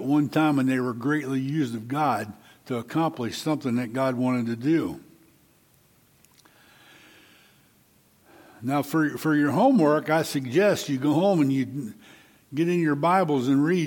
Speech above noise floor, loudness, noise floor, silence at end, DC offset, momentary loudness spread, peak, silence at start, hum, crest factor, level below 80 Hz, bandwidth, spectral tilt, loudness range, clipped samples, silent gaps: 37 dB; -24 LUFS; -61 dBFS; 0 s; under 0.1%; 10 LU; -8 dBFS; 0 s; none; 16 dB; -70 dBFS; 17.5 kHz; -6.5 dB/octave; 10 LU; under 0.1%; none